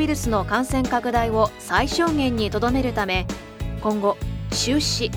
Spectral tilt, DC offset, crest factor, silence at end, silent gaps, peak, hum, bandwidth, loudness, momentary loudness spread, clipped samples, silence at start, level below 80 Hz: -4.5 dB/octave; under 0.1%; 18 dB; 0 s; none; -4 dBFS; none; over 20 kHz; -22 LUFS; 6 LU; under 0.1%; 0 s; -34 dBFS